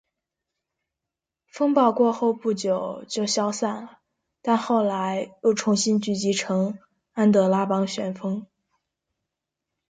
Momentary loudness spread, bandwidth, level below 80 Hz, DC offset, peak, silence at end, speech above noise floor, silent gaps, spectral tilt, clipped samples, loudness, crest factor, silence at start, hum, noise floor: 10 LU; 9.4 kHz; -70 dBFS; under 0.1%; -6 dBFS; 1.45 s; 64 dB; none; -5 dB/octave; under 0.1%; -23 LUFS; 18 dB; 1.55 s; none; -87 dBFS